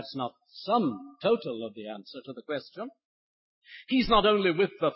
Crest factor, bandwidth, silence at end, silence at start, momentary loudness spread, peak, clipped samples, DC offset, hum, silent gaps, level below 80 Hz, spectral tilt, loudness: 20 dB; 5.8 kHz; 0 s; 0 s; 20 LU; -10 dBFS; under 0.1%; under 0.1%; none; 3.05-3.62 s; -54 dBFS; -9 dB/octave; -28 LUFS